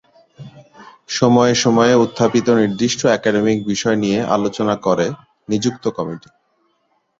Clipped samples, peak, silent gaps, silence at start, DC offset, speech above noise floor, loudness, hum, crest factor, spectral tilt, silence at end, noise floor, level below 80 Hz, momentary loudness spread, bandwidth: under 0.1%; 0 dBFS; none; 0.4 s; under 0.1%; 49 dB; -16 LUFS; none; 16 dB; -5 dB/octave; 1 s; -65 dBFS; -54 dBFS; 10 LU; 7.8 kHz